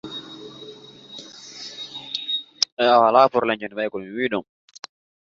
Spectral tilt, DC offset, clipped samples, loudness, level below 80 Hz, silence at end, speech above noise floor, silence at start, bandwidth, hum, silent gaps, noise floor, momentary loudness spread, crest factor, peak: -3 dB/octave; under 0.1%; under 0.1%; -21 LUFS; -68 dBFS; 0.9 s; 24 dB; 0.05 s; 7.8 kHz; none; 2.72-2.77 s; -43 dBFS; 25 LU; 22 dB; -2 dBFS